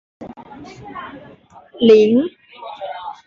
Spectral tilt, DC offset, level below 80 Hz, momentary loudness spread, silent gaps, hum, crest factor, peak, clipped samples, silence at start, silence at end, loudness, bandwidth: -6.5 dB/octave; under 0.1%; -58 dBFS; 26 LU; none; none; 16 dB; -2 dBFS; under 0.1%; 0.2 s; 0.15 s; -14 LUFS; 6.8 kHz